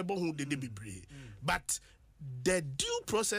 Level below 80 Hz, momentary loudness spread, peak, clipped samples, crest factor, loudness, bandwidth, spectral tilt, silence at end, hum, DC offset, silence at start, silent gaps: -58 dBFS; 15 LU; -18 dBFS; under 0.1%; 18 dB; -35 LUFS; 15.5 kHz; -3.5 dB/octave; 0 s; none; under 0.1%; 0 s; none